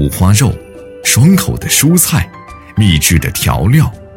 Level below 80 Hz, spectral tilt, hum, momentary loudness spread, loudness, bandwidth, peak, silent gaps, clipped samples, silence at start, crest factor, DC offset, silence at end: -26 dBFS; -4.5 dB/octave; none; 8 LU; -10 LUFS; 17.5 kHz; 0 dBFS; none; under 0.1%; 0 s; 10 dB; under 0.1%; 0.1 s